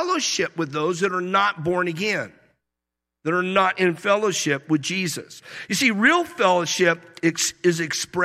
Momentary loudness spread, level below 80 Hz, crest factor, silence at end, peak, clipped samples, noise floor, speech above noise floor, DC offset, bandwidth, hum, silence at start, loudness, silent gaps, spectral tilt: 8 LU; -64 dBFS; 18 dB; 0 s; -4 dBFS; under 0.1%; -85 dBFS; 63 dB; under 0.1%; 15.5 kHz; none; 0 s; -21 LUFS; none; -3.5 dB/octave